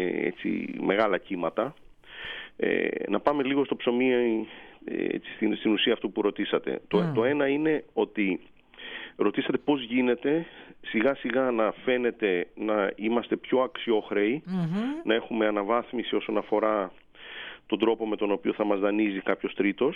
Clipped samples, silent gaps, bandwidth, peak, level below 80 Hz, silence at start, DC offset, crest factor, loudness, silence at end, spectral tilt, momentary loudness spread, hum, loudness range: under 0.1%; none; 5 kHz; -10 dBFS; -64 dBFS; 0 s; under 0.1%; 18 dB; -27 LUFS; 0 s; -8 dB/octave; 11 LU; none; 2 LU